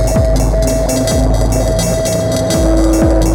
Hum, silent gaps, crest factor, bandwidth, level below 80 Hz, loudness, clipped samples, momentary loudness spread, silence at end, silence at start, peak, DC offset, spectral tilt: none; none; 10 dB; 19.5 kHz; -16 dBFS; -13 LUFS; under 0.1%; 3 LU; 0 s; 0 s; 0 dBFS; under 0.1%; -5.5 dB/octave